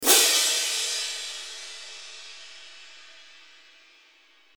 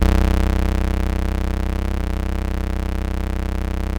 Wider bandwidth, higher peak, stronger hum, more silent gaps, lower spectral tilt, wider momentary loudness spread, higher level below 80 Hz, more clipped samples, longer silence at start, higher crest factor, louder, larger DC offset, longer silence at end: first, over 20 kHz vs 18 kHz; about the same, -4 dBFS vs -2 dBFS; neither; neither; second, 3 dB/octave vs -7 dB/octave; first, 27 LU vs 6 LU; second, -78 dBFS vs -20 dBFS; neither; about the same, 0 s vs 0 s; first, 24 dB vs 16 dB; about the same, -22 LUFS vs -23 LUFS; neither; first, 1.55 s vs 0 s